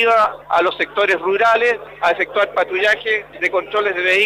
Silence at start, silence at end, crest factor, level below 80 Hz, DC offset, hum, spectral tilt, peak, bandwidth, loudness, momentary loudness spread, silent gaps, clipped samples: 0 s; 0 s; 12 dB; -56 dBFS; under 0.1%; 50 Hz at -55 dBFS; -3 dB/octave; -6 dBFS; 15.5 kHz; -17 LUFS; 5 LU; none; under 0.1%